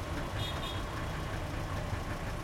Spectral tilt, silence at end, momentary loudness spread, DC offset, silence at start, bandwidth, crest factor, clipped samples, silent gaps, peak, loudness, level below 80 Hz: -5 dB/octave; 0 s; 2 LU; under 0.1%; 0 s; 16.5 kHz; 12 dB; under 0.1%; none; -24 dBFS; -37 LUFS; -42 dBFS